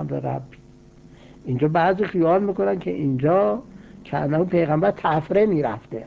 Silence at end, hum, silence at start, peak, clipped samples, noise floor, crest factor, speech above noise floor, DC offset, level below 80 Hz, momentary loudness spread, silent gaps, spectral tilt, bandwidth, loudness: 0 s; none; 0 s; -6 dBFS; under 0.1%; -48 dBFS; 14 dB; 27 dB; under 0.1%; -52 dBFS; 10 LU; none; -9.5 dB/octave; 7.2 kHz; -21 LUFS